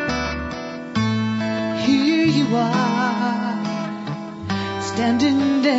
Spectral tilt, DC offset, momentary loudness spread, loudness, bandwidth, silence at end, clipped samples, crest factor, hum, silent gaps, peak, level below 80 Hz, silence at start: -5.5 dB/octave; under 0.1%; 10 LU; -21 LUFS; 8 kHz; 0 s; under 0.1%; 14 dB; none; none; -6 dBFS; -46 dBFS; 0 s